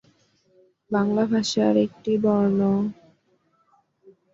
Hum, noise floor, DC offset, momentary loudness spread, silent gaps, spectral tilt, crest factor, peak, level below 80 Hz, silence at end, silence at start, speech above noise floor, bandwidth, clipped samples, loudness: none; -66 dBFS; under 0.1%; 5 LU; none; -6.5 dB/octave; 18 dB; -8 dBFS; -64 dBFS; 1.4 s; 0.9 s; 45 dB; 7.8 kHz; under 0.1%; -22 LUFS